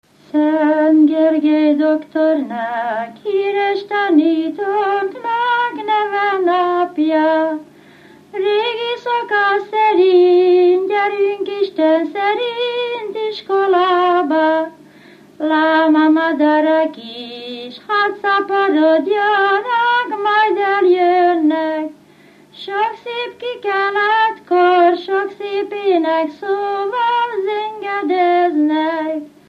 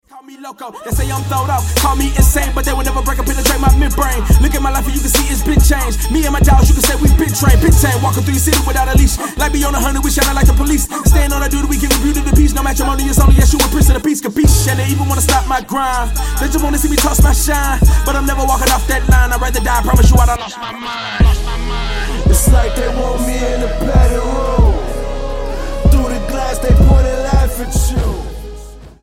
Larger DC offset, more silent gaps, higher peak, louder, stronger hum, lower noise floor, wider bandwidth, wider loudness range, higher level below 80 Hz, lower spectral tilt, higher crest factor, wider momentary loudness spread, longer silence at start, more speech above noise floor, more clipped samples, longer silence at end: neither; neither; about the same, -2 dBFS vs 0 dBFS; about the same, -15 LUFS vs -14 LUFS; neither; first, -46 dBFS vs -32 dBFS; second, 5.8 kHz vs 17 kHz; about the same, 3 LU vs 4 LU; second, -72 dBFS vs -14 dBFS; about the same, -5 dB/octave vs -4.5 dB/octave; about the same, 14 dB vs 12 dB; about the same, 10 LU vs 9 LU; first, 0.35 s vs 0.15 s; first, 32 dB vs 20 dB; neither; about the same, 0.2 s vs 0.15 s